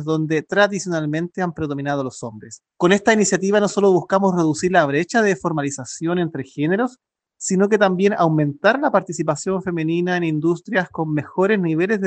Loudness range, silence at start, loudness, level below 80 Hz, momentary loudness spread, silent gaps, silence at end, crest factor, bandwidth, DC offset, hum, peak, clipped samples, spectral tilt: 3 LU; 0 s; -19 LUFS; -60 dBFS; 8 LU; none; 0 s; 18 dB; 9.2 kHz; under 0.1%; none; -2 dBFS; under 0.1%; -5.5 dB/octave